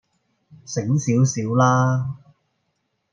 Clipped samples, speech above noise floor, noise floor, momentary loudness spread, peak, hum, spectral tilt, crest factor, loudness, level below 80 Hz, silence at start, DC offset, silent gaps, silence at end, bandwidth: under 0.1%; 54 dB; -73 dBFS; 13 LU; -6 dBFS; none; -6.5 dB/octave; 16 dB; -20 LUFS; -62 dBFS; 0.7 s; under 0.1%; none; 1 s; 7.6 kHz